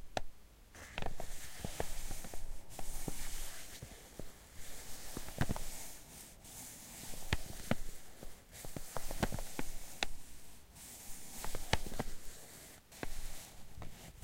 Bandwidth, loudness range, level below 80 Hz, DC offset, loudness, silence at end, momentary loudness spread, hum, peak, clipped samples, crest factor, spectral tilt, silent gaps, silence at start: 16.5 kHz; 4 LU; -46 dBFS; under 0.1%; -46 LUFS; 0 s; 13 LU; none; -10 dBFS; under 0.1%; 28 dB; -3.5 dB/octave; none; 0 s